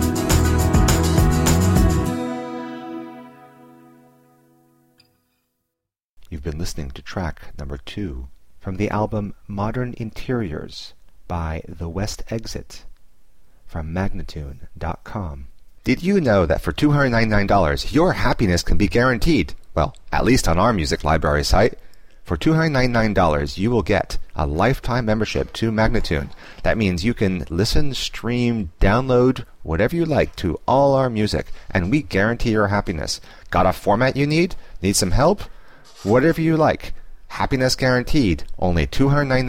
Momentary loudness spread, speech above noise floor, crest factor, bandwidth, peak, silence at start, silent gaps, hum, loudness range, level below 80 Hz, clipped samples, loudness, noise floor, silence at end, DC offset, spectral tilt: 14 LU; 63 dB; 16 dB; 16.5 kHz; -4 dBFS; 0 s; 6.04-6.17 s; none; 12 LU; -28 dBFS; under 0.1%; -20 LUFS; -82 dBFS; 0 s; 0.7%; -5.5 dB/octave